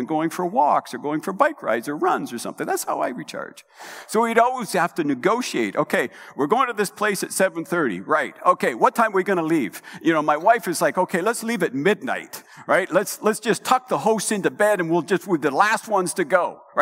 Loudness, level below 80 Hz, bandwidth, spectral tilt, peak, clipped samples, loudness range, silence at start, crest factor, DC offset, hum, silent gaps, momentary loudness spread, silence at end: -21 LUFS; -80 dBFS; 16 kHz; -4 dB/octave; 0 dBFS; under 0.1%; 3 LU; 0 s; 22 dB; under 0.1%; none; none; 9 LU; 0 s